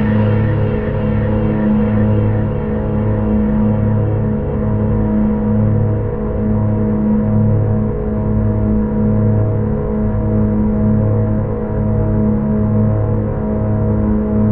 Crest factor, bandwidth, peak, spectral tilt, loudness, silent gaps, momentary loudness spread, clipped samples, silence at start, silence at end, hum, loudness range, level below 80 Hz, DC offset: 10 dB; 3.4 kHz; -4 dBFS; -10.5 dB/octave; -16 LUFS; none; 4 LU; under 0.1%; 0 s; 0 s; none; 1 LU; -24 dBFS; 1%